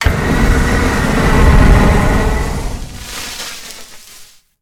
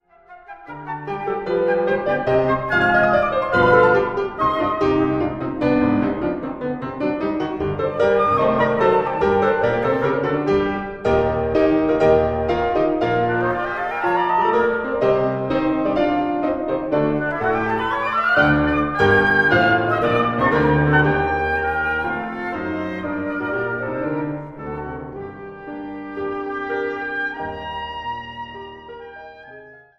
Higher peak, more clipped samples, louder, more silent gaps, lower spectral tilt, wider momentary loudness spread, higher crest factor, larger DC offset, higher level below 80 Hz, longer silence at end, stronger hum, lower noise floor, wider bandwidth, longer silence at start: about the same, 0 dBFS vs -2 dBFS; neither; first, -13 LUFS vs -19 LUFS; neither; second, -5.5 dB/octave vs -8 dB/octave; first, 18 LU vs 15 LU; second, 12 dB vs 18 dB; neither; first, -16 dBFS vs -42 dBFS; first, 0.35 s vs 0.2 s; neither; second, -40 dBFS vs -45 dBFS; first, 16.5 kHz vs 8 kHz; second, 0 s vs 0.3 s